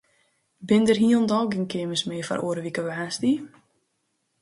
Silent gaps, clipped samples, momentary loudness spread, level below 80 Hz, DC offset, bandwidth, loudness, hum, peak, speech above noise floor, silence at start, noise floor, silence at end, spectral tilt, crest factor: none; under 0.1%; 10 LU; -66 dBFS; under 0.1%; 11.5 kHz; -24 LUFS; none; -8 dBFS; 51 dB; 0.6 s; -74 dBFS; 0.95 s; -5 dB/octave; 18 dB